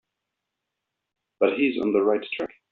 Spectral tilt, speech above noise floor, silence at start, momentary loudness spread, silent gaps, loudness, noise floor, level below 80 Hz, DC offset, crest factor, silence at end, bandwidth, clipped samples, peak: -3.5 dB/octave; 60 dB; 1.4 s; 9 LU; none; -24 LUFS; -83 dBFS; -68 dBFS; under 0.1%; 20 dB; 0.25 s; 4.6 kHz; under 0.1%; -6 dBFS